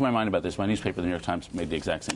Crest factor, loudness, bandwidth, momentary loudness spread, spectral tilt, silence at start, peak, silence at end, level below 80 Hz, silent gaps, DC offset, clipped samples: 18 dB; -29 LUFS; 11 kHz; 6 LU; -5.5 dB/octave; 0 s; -10 dBFS; 0 s; -50 dBFS; none; under 0.1%; under 0.1%